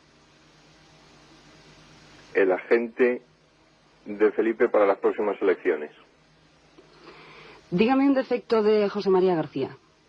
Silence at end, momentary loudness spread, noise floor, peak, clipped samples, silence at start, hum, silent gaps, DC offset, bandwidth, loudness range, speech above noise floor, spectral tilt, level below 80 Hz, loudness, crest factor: 0.35 s; 10 LU; -60 dBFS; -8 dBFS; under 0.1%; 2.35 s; none; none; under 0.1%; 7 kHz; 4 LU; 37 dB; -7.5 dB/octave; -66 dBFS; -24 LUFS; 18 dB